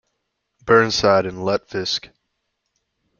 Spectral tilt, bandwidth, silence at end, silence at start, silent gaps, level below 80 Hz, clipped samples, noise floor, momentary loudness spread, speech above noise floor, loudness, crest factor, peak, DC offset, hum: -4 dB/octave; 7.2 kHz; 1.15 s; 0.65 s; none; -54 dBFS; under 0.1%; -75 dBFS; 10 LU; 57 dB; -19 LUFS; 20 dB; -2 dBFS; under 0.1%; none